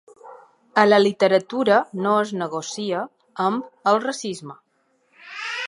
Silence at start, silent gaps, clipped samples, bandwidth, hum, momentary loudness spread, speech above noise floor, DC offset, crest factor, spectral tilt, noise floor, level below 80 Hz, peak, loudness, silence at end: 0.25 s; none; under 0.1%; 11.5 kHz; none; 15 LU; 45 dB; under 0.1%; 20 dB; -4.5 dB/octave; -65 dBFS; -76 dBFS; -2 dBFS; -21 LUFS; 0 s